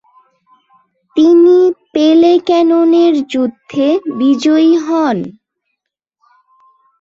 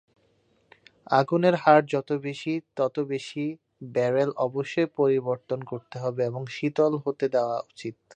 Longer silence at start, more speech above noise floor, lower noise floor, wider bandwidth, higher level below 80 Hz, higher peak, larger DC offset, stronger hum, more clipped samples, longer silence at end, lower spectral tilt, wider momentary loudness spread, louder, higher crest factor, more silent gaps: about the same, 1.15 s vs 1.1 s; first, 65 dB vs 41 dB; first, -75 dBFS vs -66 dBFS; second, 7.6 kHz vs 9.4 kHz; first, -60 dBFS vs -74 dBFS; about the same, -2 dBFS vs -4 dBFS; neither; neither; neither; first, 1.7 s vs 0 s; about the same, -6 dB/octave vs -7 dB/octave; about the same, 10 LU vs 12 LU; first, -11 LUFS vs -26 LUFS; second, 10 dB vs 22 dB; neither